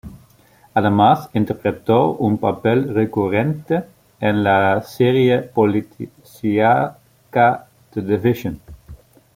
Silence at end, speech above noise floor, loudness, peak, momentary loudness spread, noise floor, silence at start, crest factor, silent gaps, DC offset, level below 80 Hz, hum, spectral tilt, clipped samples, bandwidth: 0.4 s; 35 dB; -18 LUFS; -2 dBFS; 11 LU; -52 dBFS; 0.05 s; 16 dB; none; under 0.1%; -52 dBFS; none; -8 dB/octave; under 0.1%; 16.5 kHz